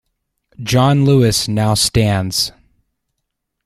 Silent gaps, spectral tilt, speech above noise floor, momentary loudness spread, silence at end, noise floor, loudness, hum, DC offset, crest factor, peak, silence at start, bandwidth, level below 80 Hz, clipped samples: none; -5 dB/octave; 61 dB; 7 LU; 1.15 s; -75 dBFS; -14 LUFS; none; under 0.1%; 16 dB; -2 dBFS; 0.6 s; 15 kHz; -38 dBFS; under 0.1%